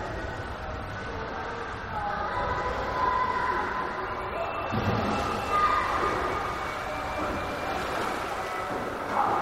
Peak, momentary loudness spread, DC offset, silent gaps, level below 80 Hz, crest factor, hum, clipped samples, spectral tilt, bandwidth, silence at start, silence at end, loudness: -14 dBFS; 9 LU; under 0.1%; none; -44 dBFS; 16 dB; none; under 0.1%; -5 dB/octave; 16 kHz; 0 s; 0 s; -29 LUFS